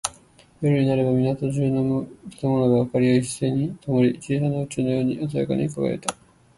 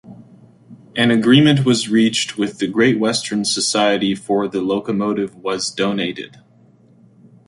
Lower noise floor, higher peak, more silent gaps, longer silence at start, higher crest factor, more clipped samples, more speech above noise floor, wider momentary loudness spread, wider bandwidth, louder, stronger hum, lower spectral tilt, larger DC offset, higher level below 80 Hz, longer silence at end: about the same, -52 dBFS vs -50 dBFS; second, -6 dBFS vs -2 dBFS; neither; about the same, 0.05 s vs 0.05 s; about the same, 18 dB vs 16 dB; neither; second, 30 dB vs 34 dB; second, 7 LU vs 11 LU; about the same, 11.5 kHz vs 11.5 kHz; second, -23 LUFS vs -17 LUFS; neither; first, -7 dB/octave vs -4.5 dB/octave; neither; about the same, -54 dBFS vs -58 dBFS; second, 0.45 s vs 1.2 s